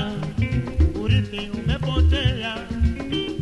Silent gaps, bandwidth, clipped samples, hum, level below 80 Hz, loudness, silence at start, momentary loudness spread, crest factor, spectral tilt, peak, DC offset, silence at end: none; 9 kHz; under 0.1%; none; -26 dBFS; -23 LUFS; 0 s; 7 LU; 14 dB; -7 dB/octave; -8 dBFS; under 0.1%; 0 s